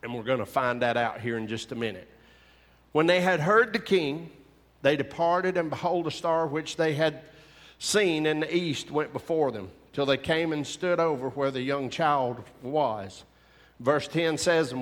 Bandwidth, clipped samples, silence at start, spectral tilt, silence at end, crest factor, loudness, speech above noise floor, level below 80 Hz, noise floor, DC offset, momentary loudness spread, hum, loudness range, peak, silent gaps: 16.5 kHz; under 0.1%; 0.05 s; -4.5 dB/octave; 0 s; 20 dB; -27 LUFS; 32 dB; -62 dBFS; -59 dBFS; under 0.1%; 10 LU; none; 3 LU; -8 dBFS; none